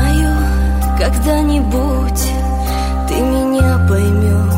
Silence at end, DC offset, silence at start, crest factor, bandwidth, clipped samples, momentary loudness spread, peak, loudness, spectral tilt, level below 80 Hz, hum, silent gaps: 0 s; under 0.1%; 0 s; 12 dB; 16.5 kHz; under 0.1%; 5 LU; -2 dBFS; -15 LUFS; -6.5 dB/octave; -16 dBFS; none; none